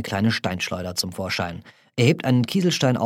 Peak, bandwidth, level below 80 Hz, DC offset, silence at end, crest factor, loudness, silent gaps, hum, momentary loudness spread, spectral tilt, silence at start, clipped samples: -4 dBFS; 16.5 kHz; -56 dBFS; under 0.1%; 0 s; 18 dB; -22 LUFS; none; none; 9 LU; -5 dB/octave; 0 s; under 0.1%